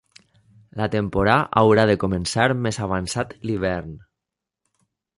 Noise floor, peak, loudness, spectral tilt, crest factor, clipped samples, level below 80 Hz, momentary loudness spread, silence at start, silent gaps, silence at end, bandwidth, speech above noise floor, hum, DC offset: -85 dBFS; -2 dBFS; -21 LUFS; -5.5 dB/octave; 20 dB; under 0.1%; -44 dBFS; 11 LU; 0.75 s; none; 1.2 s; 11.5 kHz; 65 dB; none; under 0.1%